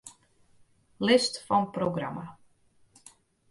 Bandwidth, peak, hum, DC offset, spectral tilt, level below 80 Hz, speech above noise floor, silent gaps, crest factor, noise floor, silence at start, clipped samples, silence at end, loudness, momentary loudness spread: 11.5 kHz; -10 dBFS; none; under 0.1%; -4.5 dB/octave; -66 dBFS; 37 dB; none; 22 dB; -63 dBFS; 0.05 s; under 0.1%; 1.2 s; -27 LUFS; 20 LU